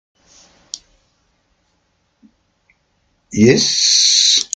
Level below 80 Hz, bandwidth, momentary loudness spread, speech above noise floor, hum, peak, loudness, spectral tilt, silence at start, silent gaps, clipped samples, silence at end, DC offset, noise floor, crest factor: -54 dBFS; 12 kHz; 24 LU; 51 dB; none; 0 dBFS; -11 LUFS; -2 dB/octave; 0.75 s; none; under 0.1%; 0.1 s; under 0.1%; -64 dBFS; 18 dB